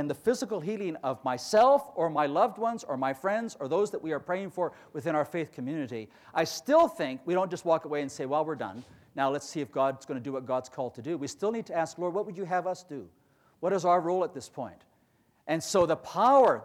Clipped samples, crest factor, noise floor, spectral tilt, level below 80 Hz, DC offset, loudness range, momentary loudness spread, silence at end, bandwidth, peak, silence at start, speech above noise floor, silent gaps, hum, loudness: under 0.1%; 18 dB; -68 dBFS; -5 dB/octave; -72 dBFS; under 0.1%; 5 LU; 13 LU; 0 s; 16 kHz; -12 dBFS; 0 s; 39 dB; none; none; -29 LUFS